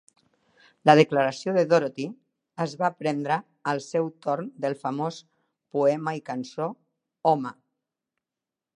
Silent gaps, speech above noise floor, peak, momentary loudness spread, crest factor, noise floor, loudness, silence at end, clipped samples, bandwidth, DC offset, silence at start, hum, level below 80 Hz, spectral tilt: none; 64 dB; -2 dBFS; 14 LU; 24 dB; -89 dBFS; -26 LUFS; 1.25 s; under 0.1%; 10.5 kHz; under 0.1%; 0.85 s; none; -78 dBFS; -6 dB/octave